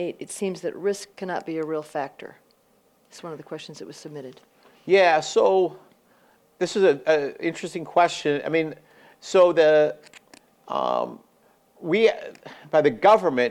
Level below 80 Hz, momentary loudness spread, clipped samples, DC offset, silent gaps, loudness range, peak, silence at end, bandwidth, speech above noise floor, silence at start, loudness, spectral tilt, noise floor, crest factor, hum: -72 dBFS; 21 LU; under 0.1%; under 0.1%; none; 10 LU; -6 dBFS; 0 s; 13.5 kHz; 40 dB; 0 s; -22 LUFS; -4.5 dB/octave; -62 dBFS; 18 dB; none